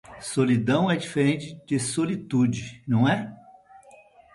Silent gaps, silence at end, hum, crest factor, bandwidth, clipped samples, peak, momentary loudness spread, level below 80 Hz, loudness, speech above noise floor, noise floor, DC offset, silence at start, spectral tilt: none; 1 s; none; 16 dB; 11.5 kHz; under 0.1%; -10 dBFS; 8 LU; -60 dBFS; -25 LUFS; 29 dB; -52 dBFS; under 0.1%; 0.1 s; -6 dB/octave